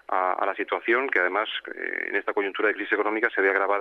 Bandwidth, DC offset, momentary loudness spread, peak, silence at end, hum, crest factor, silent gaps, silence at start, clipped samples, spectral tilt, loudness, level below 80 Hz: 6 kHz; under 0.1%; 7 LU; -8 dBFS; 0 s; none; 18 dB; none; 0.1 s; under 0.1%; -4.5 dB/octave; -25 LUFS; -76 dBFS